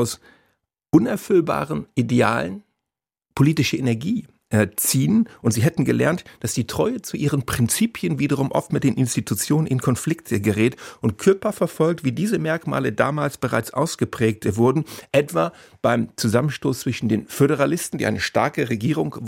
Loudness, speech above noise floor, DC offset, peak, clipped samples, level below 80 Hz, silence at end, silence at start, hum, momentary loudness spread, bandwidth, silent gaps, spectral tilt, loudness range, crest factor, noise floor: -21 LUFS; 66 dB; under 0.1%; -2 dBFS; under 0.1%; -52 dBFS; 0 s; 0 s; none; 6 LU; 16.5 kHz; none; -5.5 dB/octave; 1 LU; 18 dB; -86 dBFS